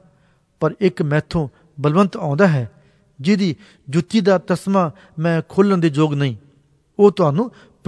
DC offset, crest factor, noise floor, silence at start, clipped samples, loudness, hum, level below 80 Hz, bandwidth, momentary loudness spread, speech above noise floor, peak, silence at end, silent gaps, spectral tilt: under 0.1%; 18 dB; -58 dBFS; 0.6 s; under 0.1%; -18 LUFS; none; -50 dBFS; 11 kHz; 9 LU; 41 dB; -2 dBFS; 0.4 s; none; -7.5 dB/octave